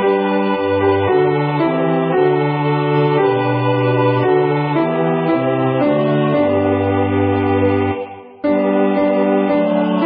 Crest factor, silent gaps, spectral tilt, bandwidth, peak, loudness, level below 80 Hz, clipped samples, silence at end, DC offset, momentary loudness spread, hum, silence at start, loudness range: 12 dB; none; -13 dB/octave; 4.9 kHz; -4 dBFS; -16 LUFS; -42 dBFS; under 0.1%; 0 s; under 0.1%; 2 LU; none; 0 s; 1 LU